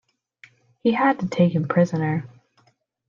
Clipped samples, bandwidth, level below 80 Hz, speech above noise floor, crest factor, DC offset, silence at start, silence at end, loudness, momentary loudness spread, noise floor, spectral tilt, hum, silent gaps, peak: under 0.1%; 7.2 kHz; -68 dBFS; 43 dB; 18 dB; under 0.1%; 0.85 s; 0.8 s; -21 LUFS; 6 LU; -63 dBFS; -8 dB/octave; none; none; -6 dBFS